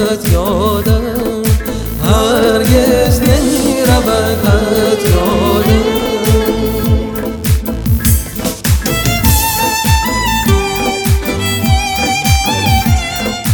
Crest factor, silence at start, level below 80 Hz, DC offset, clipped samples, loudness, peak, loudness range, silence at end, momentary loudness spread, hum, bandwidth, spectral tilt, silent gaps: 12 dB; 0 s; -20 dBFS; under 0.1%; under 0.1%; -12 LUFS; 0 dBFS; 2 LU; 0 s; 5 LU; none; 19.5 kHz; -5 dB/octave; none